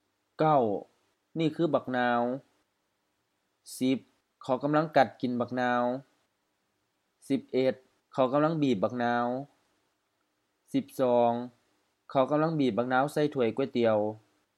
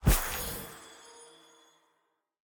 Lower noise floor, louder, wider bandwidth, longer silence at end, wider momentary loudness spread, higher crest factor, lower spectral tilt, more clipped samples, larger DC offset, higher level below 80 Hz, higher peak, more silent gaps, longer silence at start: about the same, -78 dBFS vs -77 dBFS; first, -29 LUFS vs -33 LUFS; second, 14 kHz vs over 20 kHz; second, 0.4 s vs 1.3 s; second, 12 LU vs 24 LU; about the same, 22 dB vs 22 dB; first, -7 dB/octave vs -4 dB/octave; neither; neither; second, -80 dBFS vs -38 dBFS; first, -8 dBFS vs -12 dBFS; neither; first, 0.4 s vs 0 s